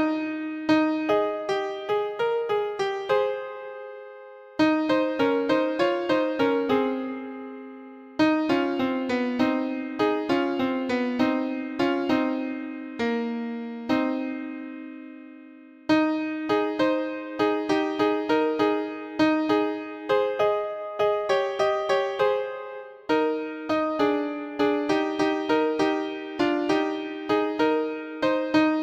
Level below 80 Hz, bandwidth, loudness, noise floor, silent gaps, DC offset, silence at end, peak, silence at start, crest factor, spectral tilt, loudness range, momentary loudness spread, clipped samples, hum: -64 dBFS; 8.2 kHz; -25 LUFS; -47 dBFS; none; under 0.1%; 0 s; -8 dBFS; 0 s; 16 dB; -5.5 dB/octave; 3 LU; 13 LU; under 0.1%; none